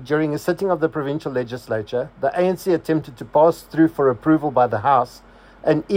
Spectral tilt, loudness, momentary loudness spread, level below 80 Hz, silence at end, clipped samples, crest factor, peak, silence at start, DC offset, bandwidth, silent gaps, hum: -7.5 dB/octave; -20 LUFS; 9 LU; -54 dBFS; 0 s; under 0.1%; 16 dB; -4 dBFS; 0 s; under 0.1%; 16 kHz; none; none